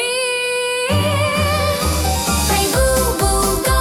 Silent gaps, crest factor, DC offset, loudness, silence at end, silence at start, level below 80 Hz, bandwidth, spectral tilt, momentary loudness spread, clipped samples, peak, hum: none; 14 dB; under 0.1%; -16 LUFS; 0 s; 0 s; -26 dBFS; 18 kHz; -3.5 dB/octave; 3 LU; under 0.1%; -2 dBFS; none